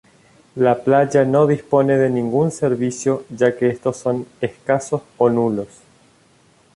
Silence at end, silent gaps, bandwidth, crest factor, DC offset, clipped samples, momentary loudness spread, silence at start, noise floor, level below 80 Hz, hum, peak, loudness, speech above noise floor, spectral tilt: 1.1 s; none; 11.5 kHz; 16 dB; under 0.1%; under 0.1%; 10 LU; 0.55 s; -54 dBFS; -58 dBFS; none; -2 dBFS; -18 LUFS; 37 dB; -7 dB/octave